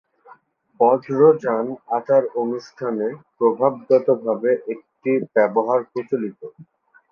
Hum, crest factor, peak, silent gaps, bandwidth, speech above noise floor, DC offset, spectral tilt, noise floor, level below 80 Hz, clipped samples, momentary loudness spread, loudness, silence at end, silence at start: none; 18 dB; -2 dBFS; none; 6.6 kHz; 32 dB; under 0.1%; -8.5 dB/octave; -52 dBFS; -72 dBFS; under 0.1%; 12 LU; -20 LUFS; 0.5 s; 0.8 s